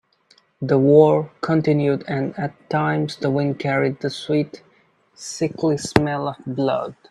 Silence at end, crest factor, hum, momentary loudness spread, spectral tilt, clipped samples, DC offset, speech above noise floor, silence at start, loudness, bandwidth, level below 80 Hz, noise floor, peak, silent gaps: 0.15 s; 20 dB; none; 13 LU; -6.5 dB/octave; under 0.1%; under 0.1%; 39 dB; 0.6 s; -20 LUFS; 12 kHz; -52 dBFS; -58 dBFS; 0 dBFS; none